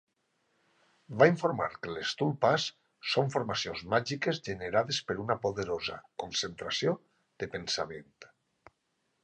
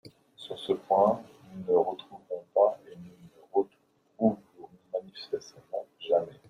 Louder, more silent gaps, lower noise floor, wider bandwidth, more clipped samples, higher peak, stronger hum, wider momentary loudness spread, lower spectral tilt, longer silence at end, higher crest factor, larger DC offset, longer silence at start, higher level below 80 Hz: about the same, -31 LUFS vs -30 LUFS; neither; first, -78 dBFS vs -68 dBFS; second, 9.8 kHz vs 11.5 kHz; neither; about the same, -8 dBFS vs -10 dBFS; neither; second, 13 LU vs 18 LU; second, -4.5 dB/octave vs -7 dB/octave; first, 1 s vs 0.15 s; about the same, 24 dB vs 20 dB; neither; first, 1.1 s vs 0.05 s; first, -64 dBFS vs -74 dBFS